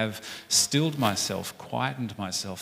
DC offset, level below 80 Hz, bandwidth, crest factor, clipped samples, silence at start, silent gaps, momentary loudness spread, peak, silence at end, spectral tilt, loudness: under 0.1%; -66 dBFS; 16 kHz; 20 dB; under 0.1%; 0 s; none; 12 LU; -8 dBFS; 0 s; -3 dB/octave; -27 LUFS